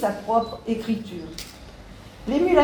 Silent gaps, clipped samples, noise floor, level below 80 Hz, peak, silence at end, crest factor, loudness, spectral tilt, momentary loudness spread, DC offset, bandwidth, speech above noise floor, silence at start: none; under 0.1%; -43 dBFS; -48 dBFS; -4 dBFS; 0 s; 20 dB; -26 LUFS; -6 dB/octave; 21 LU; under 0.1%; over 20 kHz; 20 dB; 0 s